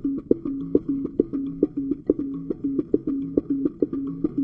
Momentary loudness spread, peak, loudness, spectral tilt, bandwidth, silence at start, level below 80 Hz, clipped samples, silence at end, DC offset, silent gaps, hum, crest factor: 3 LU; -2 dBFS; -26 LUFS; -12.5 dB/octave; 2.4 kHz; 0 s; -50 dBFS; under 0.1%; 0 s; under 0.1%; none; none; 22 dB